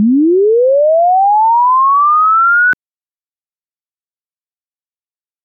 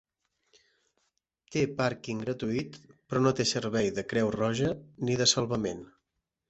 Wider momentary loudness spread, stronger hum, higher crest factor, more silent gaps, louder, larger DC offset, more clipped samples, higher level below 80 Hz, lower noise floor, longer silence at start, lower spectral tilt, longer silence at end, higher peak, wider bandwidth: second, 2 LU vs 10 LU; neither; second, 6 dB vs 20 dB; neither; first, -9 LUFS vs -29 LUFS; neither; neither; second, -74 dBFS vs -60 dBFS; first, under -90 dBFS vs -84 dBFS; second, 0 s vs 1.5 s; first, -9.5 dB/octave vs -4.5 dB/octave; first, 2.7 s vs 0.65 s; first, -6 dBFS vs -10 dBFS; second, 4.2 kHz vs 8.2 kHz